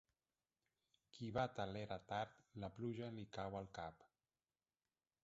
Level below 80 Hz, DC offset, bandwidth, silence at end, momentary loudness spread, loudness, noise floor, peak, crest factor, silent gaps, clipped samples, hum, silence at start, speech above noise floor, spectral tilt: -72 dBFS; under 0.1%; 7.6 kHz; 1.15 s; 10 LU; -49 LUFS; under -90 dBFS; -28 dBFS; 24 dB; none; under 0.1%; none; 1.15 s; over 42 dB; -5 dB/octave